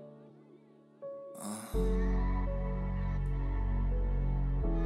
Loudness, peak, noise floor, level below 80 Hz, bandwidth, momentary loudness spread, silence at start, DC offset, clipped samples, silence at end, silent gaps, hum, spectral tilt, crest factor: -36 LUFS; -20 dBFS; -59 dBFS; -34 dBFS; 12.5 kHz; 13 LU; 0 s; under 0.1%; under 0.1%; 0 s; none; none; -7.5 dB/octave; 12 dB